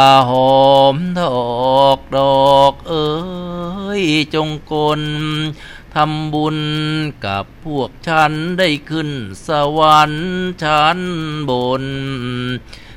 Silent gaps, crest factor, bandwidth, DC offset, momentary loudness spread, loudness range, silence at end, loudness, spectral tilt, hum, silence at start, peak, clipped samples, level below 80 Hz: none; 14 dB; 16 kHz; under 0.1%; 12 LU; 6 LU; 0 s; -15 LUFS; -5.5 dB/octave; none; 0 s; 0 dBFS; under 0.1%; -40 dBFS